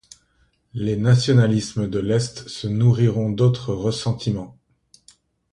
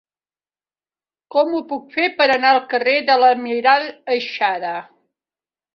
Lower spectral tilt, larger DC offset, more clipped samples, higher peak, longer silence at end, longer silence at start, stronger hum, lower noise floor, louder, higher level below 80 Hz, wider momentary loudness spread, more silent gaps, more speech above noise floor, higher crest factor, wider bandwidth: first, -6.5 dB/octave vs -4 dB/octave; neither; neither; about the same, -4 dBFS vs -2 dBFS; about the same, 1 s vs 0.9 s; second, 0.75 s vs 1.35 s; neither; second, -63 dBFS vs under -90 dBFS; second, -21 LUFS vs -17 LUFS; first, -48 dBFS vs -70 dBFS; about the same, 12 LU vs 11 LU; neither; second, 44 dB vs over 73 dB; about the same, 18 dB vs 16 dB; first, 11 kHz vs 6.8 kHz